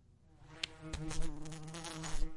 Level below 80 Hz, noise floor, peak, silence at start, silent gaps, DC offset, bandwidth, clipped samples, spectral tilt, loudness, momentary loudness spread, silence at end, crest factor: -44 dBFS; -61 dBFS; -16 dBFS; 0.4 s; none; under 0.1%; 11.5 kHz; under 0.1%; -3.5 dB/octave; -45 LUFS; 7 LU; 0 s; 22 dB